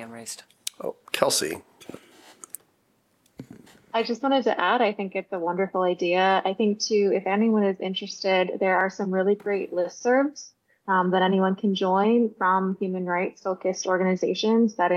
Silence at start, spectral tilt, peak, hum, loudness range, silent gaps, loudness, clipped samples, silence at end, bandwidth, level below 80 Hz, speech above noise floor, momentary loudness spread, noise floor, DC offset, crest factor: 0 s; -4.5 dB/octave; -2 dBFS; none; 7 LU; none; -24 LUFS; under 0.1%; 0 s; 15 kHz; -76 dBFS; 43 dB; 15 LU; -67 dBFS; under 0.1%; 22 dB